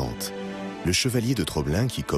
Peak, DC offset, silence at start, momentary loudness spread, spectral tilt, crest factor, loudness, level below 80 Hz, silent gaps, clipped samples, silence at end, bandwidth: -8 dBFS; under 0.1%; 0 s; 10 LU; -4.5 dB/octave; 18 dB; -26 LUFS; -42 dBFS; none; under 0.1%; 0 s; 15.5 kHz